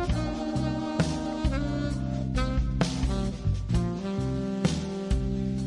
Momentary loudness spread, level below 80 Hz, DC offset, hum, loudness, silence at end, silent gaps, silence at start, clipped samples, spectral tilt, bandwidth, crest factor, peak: 2 LU; -34 dBFS; under 0.1%; none; -29 LUFS; 0 s; none; 0 s; under 0.1%; -6.5 dB/octave; 11.5 kHz; 18 dB; -10 dBFS